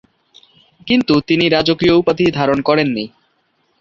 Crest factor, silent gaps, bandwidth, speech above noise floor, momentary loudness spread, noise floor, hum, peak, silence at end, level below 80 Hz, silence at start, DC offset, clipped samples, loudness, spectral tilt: 16 dB; none; 7.4 kHz; 48 dB; 9 LU; -62 dBFS; none; -2 dBFS; 0.7 s; -46 dBFS; 0.85 s; under 0.1%; under 0.1%; -14 LUFS; -6.5 dB/octave